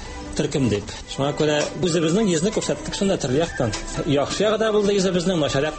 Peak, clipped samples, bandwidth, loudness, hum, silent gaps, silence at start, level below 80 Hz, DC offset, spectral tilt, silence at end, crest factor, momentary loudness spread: -8 dBFS; under 0.1%; 8.8 kHz; -22 LUFS; none; none; 0 s; -40 dBFS; under 0.1%; -5 dB/octave; 0 s; 14 dB; 6 LU